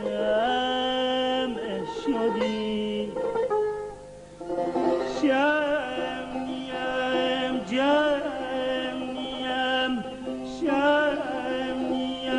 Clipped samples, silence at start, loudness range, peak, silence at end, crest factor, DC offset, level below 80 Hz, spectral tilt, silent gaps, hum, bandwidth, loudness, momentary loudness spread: under 0.1%; 0 s; 2 LU; -12 dBFS; 0 s; 14 dB; under 0.1%; -54 dBFS; -4.5 dB/octave; none; 50 Hz at -55 dBFS; 10.5 kHz; -26 LUFS; 9 LU